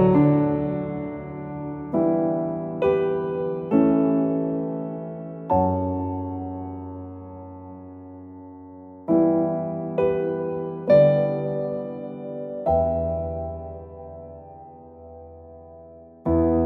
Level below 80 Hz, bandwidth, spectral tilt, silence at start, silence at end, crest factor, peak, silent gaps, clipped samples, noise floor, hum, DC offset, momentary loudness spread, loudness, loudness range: -46 dBFS; 4.5 kHz; -11.5 dB/octave; 0 s; 0 s; 18 dB; -6 dBFS; none; under 0.1%; -45 dBFS; none; under 0.1%; 23 LU; -24 LUFS; 8 LU